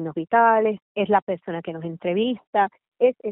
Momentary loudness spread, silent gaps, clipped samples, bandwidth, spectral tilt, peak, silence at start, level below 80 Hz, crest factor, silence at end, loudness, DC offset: 12 LU; 0.82-0.95 s, 1.22-1.27 s, 2.47-2.53 s, 2.88-2.92 s; under 0.1%; 4 kHz; -4 dB/octave; -6 dBFS; 0 s; -68 dBFS; 18 dB; 0 s; -22 LUFS; under 0.1%